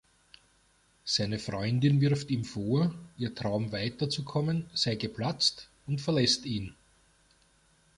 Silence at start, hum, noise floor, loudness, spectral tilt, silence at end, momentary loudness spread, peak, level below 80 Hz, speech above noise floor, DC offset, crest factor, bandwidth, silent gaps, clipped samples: 1.05 s; none; -67 dBFS; -30 LUFS; -5 dB/octave; 1.25 s; 11 LU; -12 dBFS; -60 dBFS; 37 dB; under 0.1%; 20 dB; 11.5 kHz; none; under 0.1%